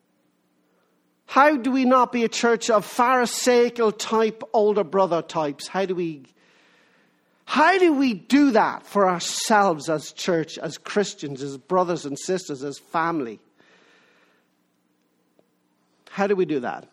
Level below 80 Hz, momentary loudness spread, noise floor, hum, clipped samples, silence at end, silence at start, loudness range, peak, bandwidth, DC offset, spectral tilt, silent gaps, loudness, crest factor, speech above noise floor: -72 dBFS; 10 LU; -68 dBFS; none; under 0.1%; 0.1 s; 1.3 s; 11 LU; -2 dBFS; 15 kHz; under 0.1%; -4 dB/octave; none; -22 LUFS; 20 dB; 46 dB